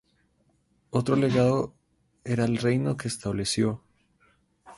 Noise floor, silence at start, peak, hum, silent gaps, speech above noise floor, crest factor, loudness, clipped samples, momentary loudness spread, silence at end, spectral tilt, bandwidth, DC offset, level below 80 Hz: -68 dBFS; 0.95 s; -10 dBFS; none; none; 43 dB; 18 dB; -26 LUFS; under 0.1%; 9 LU; 0.05 s; -6 dB/octave; 11.5 kHz; under 0.1%; -56 dBFS